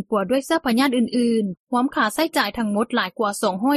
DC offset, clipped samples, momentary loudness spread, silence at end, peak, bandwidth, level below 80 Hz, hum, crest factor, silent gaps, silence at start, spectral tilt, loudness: under 0.1%; under 0.1%; 4 LU; 0 s; -6 dBFS; 14.5 kHz; -58 dBFS; none; 16 dB; 1.59-1.67 s; 0 s; -4.5 dB/octave; -21 LUFS